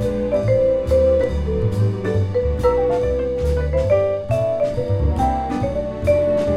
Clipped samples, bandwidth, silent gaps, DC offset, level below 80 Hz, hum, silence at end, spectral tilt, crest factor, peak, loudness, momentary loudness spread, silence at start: under 0.1%; 12 kHz; none; under 0.1%; -28 dBFS; none; 0 s; -8.5 dB/octave; 14 dB; -4 dBFS; -19 LUFS; 4 LU; 0 s